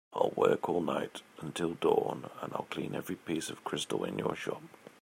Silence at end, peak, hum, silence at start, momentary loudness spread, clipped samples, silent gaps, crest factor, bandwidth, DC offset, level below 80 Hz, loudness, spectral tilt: 0.15 s; -12 dBFS; none; 0.1 s; 12 LU; under 0.1%; none; 22 dB; 16 kHz; under 0.1%; -74 dBFS; -34 LUFS; -5 dB/octave